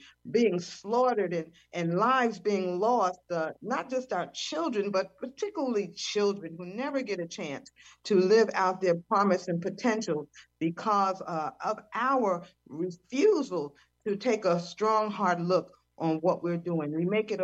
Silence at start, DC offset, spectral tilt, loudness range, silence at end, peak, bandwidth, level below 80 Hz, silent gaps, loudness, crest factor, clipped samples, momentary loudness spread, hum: 0.05 s; under 0.1%; -5.5 dB/octave; 4 LU; 0 s; -12 dBFS; 8.2 kHz; -76 dBFS; none; -29 LUFS; 16 dB; under 0.1%; 11 LU; none